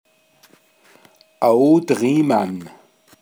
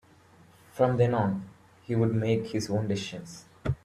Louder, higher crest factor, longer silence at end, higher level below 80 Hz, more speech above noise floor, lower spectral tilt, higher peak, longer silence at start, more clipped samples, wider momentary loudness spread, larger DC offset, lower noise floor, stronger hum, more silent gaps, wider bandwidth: first, -17 LUFS vs -28 LUFS; about the same, 18 dB vs 18 dB; first, 0.55 s vs 0.1 s; second, -74 dBFS vs -54 dBFS; first, 38 dB vs 30 dB; about the same, -7 dB/octave vs -7 dB/octave; first, -2 dBFS vs -10 dBFS; first, 1.4 s vs 0.75 s; neither; second, 10 LU vs 18 LU; neither; about the same, -54 dBFS vs -57 dBFS; neither; neither; first, 20 kHz vs 13 kHz